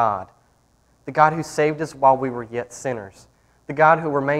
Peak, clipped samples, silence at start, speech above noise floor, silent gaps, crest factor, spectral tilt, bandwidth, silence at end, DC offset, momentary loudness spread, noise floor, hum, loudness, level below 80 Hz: 0 dBFS; under 0.1%; 0 s; 40 dB; none; 20 dB; -6 dB/octave; 13.5 kHz; 0 s; under 0.1%; 15 LU; -60 dBFS; none; -20 LUFS; -58 dBFS